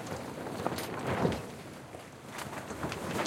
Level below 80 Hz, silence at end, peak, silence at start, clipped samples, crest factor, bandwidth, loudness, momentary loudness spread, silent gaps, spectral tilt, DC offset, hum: -58 dBFS; 0 s; -14 dBFS; 0 s; under 0.1%; 22 dB; 16.5 kHz; -37 LUFS; 14 LU; none; -5 dB/octave; under 0.1%; none